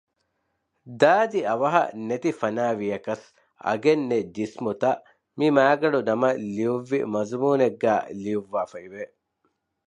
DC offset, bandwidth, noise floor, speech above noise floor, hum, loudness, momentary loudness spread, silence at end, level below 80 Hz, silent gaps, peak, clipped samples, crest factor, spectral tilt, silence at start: under 0.1%; 10 kHz; -75 dBFS; 52 dB; none; -24 LUFS; 13 LU; 0.85 s; -70 dBFS; none; -4 dBFS; under 0.1%; 20 dB; -6.5 dB/octave; 0.85 s